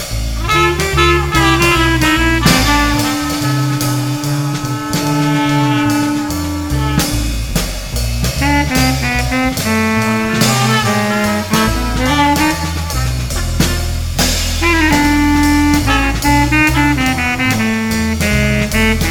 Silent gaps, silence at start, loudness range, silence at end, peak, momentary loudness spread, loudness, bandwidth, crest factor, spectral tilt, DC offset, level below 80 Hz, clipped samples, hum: none; 0 s; 4 LU; 0 s; 0 dBFS; 7 LU; -13 LUFS; 19.5 kHz; 14 dB; -4.5 dB/octave; under 0.1%; -22 dBFS; under 0.1%; none